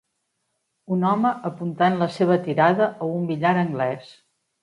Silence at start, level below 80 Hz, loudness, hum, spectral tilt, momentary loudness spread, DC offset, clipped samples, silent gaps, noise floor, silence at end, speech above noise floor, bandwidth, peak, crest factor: 0.9 s; -68 dBFS; -22 LUFS; none; -8 dB/octave; 9 LU; under 0.1%; under 0.1%; none; -75 dBFS; 0.5 s; 54 dB; 10.5 kHz; -4 dBFS; 18 dB